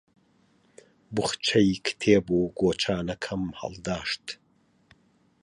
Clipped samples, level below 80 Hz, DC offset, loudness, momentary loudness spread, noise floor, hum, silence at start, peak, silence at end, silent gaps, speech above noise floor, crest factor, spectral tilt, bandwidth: under 0.1%; -54 dBFS; under 0.1%; -26 LUFS; 12 LU; -64 dBFS; none; 1.1 s; -6 dBFS; 1.1 s; none; 38 dB; 22 dB; -5 dB/octave; 11 kHz